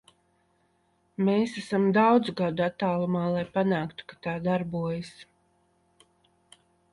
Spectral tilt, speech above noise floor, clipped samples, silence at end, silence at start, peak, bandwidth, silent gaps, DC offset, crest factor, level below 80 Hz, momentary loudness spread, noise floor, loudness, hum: -7.5 dB/octave; 43 dB; under 0.1%; 1.7 s; 1.2 s; -10 dBFS; 11 kHz; none; under 0.1%; 18 dB; -64 dBFS; 14 LU; -69 dBFS; -27 LUFS; none